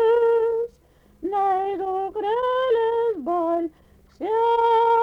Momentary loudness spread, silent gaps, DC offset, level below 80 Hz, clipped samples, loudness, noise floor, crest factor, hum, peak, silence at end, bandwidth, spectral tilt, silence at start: 10 LU; none; under 0.1%; -58 dBFS; under 0.1%; -22 LUFS; -56 dBFS; 12 dB; none; -10 dBFS; 0 s; 5.4 kHz; -5.5 dB/octave; 0 s